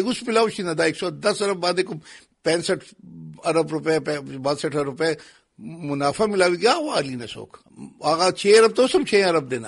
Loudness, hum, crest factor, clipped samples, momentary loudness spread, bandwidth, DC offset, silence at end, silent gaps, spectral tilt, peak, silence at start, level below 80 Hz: -21 LUFS; none; 18 dB; under 0.1%; 15 LU; 11.5 kHz; under 0.1%; 0 s; none; -4 dB/octave; -4 dBFS; 0 s; -62 dBFS